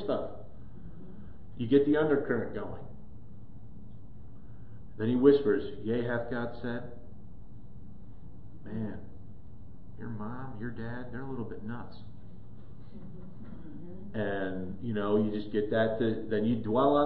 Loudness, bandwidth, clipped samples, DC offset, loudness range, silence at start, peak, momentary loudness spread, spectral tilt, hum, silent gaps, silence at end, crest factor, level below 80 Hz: -31 LUFS; 4.7 kHz; under 0.1%; 1%; 13 LU; 0 s; -10 dBFS; 25 LU; -10.5 dB/octave; none; none; 0 s; 24 dB; -54 dBFS